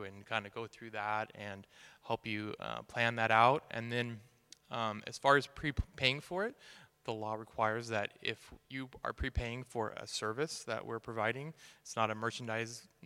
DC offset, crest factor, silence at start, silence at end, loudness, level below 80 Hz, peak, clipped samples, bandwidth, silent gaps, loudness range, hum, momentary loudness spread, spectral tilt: under 0.1%; 26 dB; 0 s; 0.2 s; -36 LUFS; -54 dBFS; -12 dBFS; under 0.1%; 16.5 kHz; none; 6 LU; none; 16 LU; -4.5 dB/octave